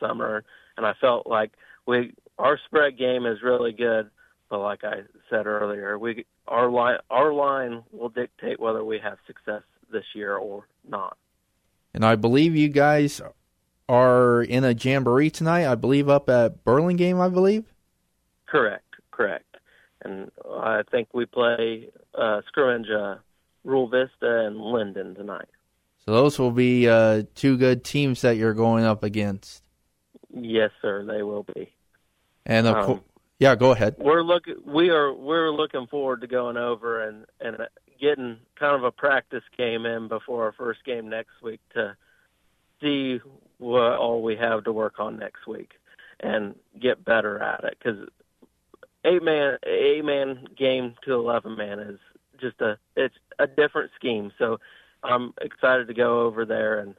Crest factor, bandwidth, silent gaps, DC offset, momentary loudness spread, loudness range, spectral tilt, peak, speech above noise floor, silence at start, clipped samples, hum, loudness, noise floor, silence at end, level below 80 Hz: 20 dB; 14.5 kHz; none; under 0.1%; 17 LU; 8 LU; -6.5 dB/octave; -4 dBFS; 48 dB; 0 s; under 0.1%; none; -23 LUFS; -71 dBFS; 0.05 s; -60 dBFS